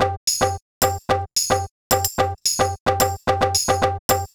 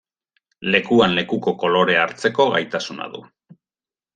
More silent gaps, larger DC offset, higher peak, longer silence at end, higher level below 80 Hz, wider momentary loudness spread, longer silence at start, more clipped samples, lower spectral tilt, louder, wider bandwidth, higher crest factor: first, 0.17-0.27 s, 0.62-0.81 s, 1.71-1.90 s, 2.80-2.86 s, 3.99-4.09 s vs none; neither; about the same, -4 dBFS vs -2 dBFS; second, 0.1 s vs 0.95 s; first, -42 dBFS vs -60 dBFS; second, 3 LU vs 14 LU; second, 0 s vs 0.6 s; neither; second, -3 dB/octave vs -5 dB/octave; about the same, -20 LUFS vs -19 LUFS; first, over 20 kHz vs 9.4 kHz; about the same, 18 dB vs 20 dB